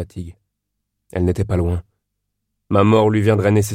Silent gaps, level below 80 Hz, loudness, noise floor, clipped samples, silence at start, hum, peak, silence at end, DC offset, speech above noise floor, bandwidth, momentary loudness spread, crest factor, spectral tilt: none; -38 dBFS; -17 LUFS; -76 dBFS; under 0.1%; 0 s; 50 Hz at -40 dBFS; -2 dBFS; 0 s; under 0.1%; 60 dB; 16 kHz; 17 LU; 18 dB; -7 dB/octave